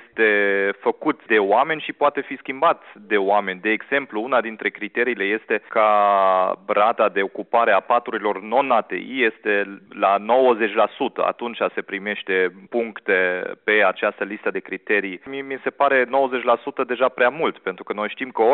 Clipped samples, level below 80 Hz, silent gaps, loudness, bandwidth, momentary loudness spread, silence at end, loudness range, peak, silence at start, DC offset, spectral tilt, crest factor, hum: under 0.1%; -70 dBFS; none; -21 LUFS; 4.2 kHz; 9 LU; 0 s; 3 LU; -4 dBFS; 0.15 s; under 0.1%; -1.5 dB/octave; 16 dB; none